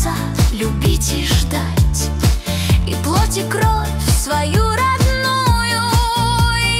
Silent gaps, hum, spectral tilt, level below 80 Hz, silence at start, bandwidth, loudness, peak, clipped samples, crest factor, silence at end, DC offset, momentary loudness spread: none; none; -4.5 dB/octave; -20 dBFS; 0 s; 16.5 kHz; -16 LUFS; -2 dBFS; under 0.1%; 12 dB; 0 s; under 0.1%; 3 LU